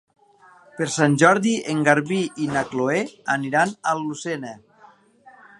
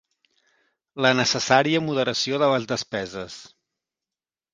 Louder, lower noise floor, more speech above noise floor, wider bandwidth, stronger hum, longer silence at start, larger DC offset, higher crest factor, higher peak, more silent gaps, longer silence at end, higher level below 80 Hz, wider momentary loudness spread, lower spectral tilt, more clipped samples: about the same, -21 LUFS vs -22 LUFS; second, -53 dBFS vs under -90 dBFS; second, 31 dB vs over 68 dB; first, 11.5 kHz vs 10 kHz; neither; second, 0.75 s vs 0.95 s; neither; about the same, 22 dB vs 24 dB; about the same, -2 dBFS vs -2 dBFS; neither; about the same, 1.05 s vs 1.1 s; about the same, -66 dBFS vs -62 dBFS; second, 13 LU vs 17 LU; first, -5 dB/octave vs -3.5 dB/octave; neither